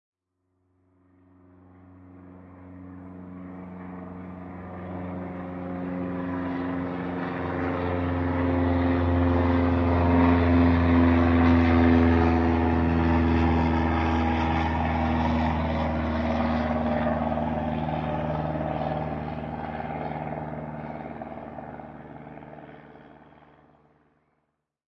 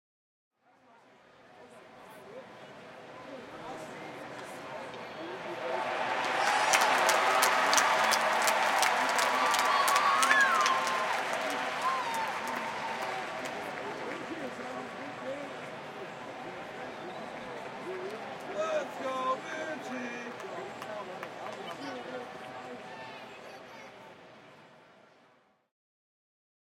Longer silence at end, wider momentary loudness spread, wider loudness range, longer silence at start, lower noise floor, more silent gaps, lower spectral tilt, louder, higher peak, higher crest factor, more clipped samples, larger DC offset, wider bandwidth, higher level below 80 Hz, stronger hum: about the same, 1.95 s vs 1.95 s; about the same, 20 LU vs 21 LU; about the same, 20 LU vs 20 LU; first, 1.9 s vs 1.5 s; first, -77 dBFS vs -66 dBFS; neither; first, -9 dB/octave vs -1 dB/octave; first, -25 LUFS vs -30 LUFS; about the same, -8 dBFS vs -8 dBFS; second, 18 dB vs 26 dB; neither; neither; second, 6 kHz vs 17 kHz; first, -42 dBFS vs -78 dBFS; neither